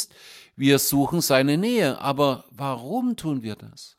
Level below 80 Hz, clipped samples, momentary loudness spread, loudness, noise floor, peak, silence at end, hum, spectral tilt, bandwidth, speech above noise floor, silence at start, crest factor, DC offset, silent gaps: -58 dBFS; under 0.1%; 11 LU; -23 LUFS; -48 dBFS; -4 dBFS; 0.1 s; none; -4.5 dB/octave; 16.5 kHz; 26 dB; 0 s; 20 dB; under 0.1%; none